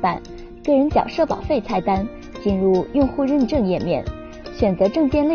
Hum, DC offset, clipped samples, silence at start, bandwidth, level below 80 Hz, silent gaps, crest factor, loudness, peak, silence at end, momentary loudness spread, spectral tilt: none; under 0.1%; under 0.1%; 0 s; 6.8 kHz; -36 dBFS; none; 14 dB; -20 LUFS; -4 dBFS; 0 s; 13 LU; -6.5 dB/octave